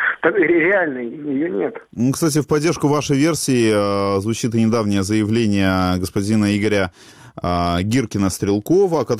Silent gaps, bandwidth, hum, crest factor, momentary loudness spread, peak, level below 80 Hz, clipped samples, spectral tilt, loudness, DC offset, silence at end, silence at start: none; 16 kHz; none; 16 dB; 6 LU; -2 dBFS; -46 dBFS; under 0.1%; -5.5 dB/octave; -18 LUFS; under 0.1%; 0 s; 0 s